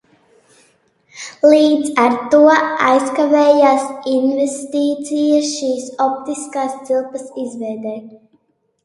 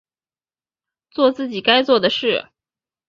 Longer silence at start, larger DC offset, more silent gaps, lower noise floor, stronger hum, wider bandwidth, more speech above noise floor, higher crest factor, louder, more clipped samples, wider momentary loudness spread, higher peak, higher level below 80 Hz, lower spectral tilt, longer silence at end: about the same, 1.15 s vs 1.15 s; neither; neither; second, -61 dBFS vs under -90 dBFS; neither; first, 11.5 kHz vs 7.2 kHz; second, 46 dB vs over 73 dB; about the same, 16 dB vs 20 dB; about the same, -15 LUFS vs -17 LUFS; neither; first, 15 LU vs 8 LU; about the same, 0 dBFS vs 0 dBFS; about the same, -66 dBFS vs -64 dBFS; second, -3.5 dB/octave vs -5 dB/octave; about the same, 0.7 s vs 0.65 s